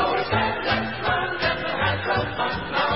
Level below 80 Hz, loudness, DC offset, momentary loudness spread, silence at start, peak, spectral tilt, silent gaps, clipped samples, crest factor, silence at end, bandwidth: -42 dBFS; -23 LUFS; 0.5%; 2 LU; 0 s; -8 dBFS; -9 dB/octave; none; under 0.1%; 14 dB; 0 s; 5.8 kHz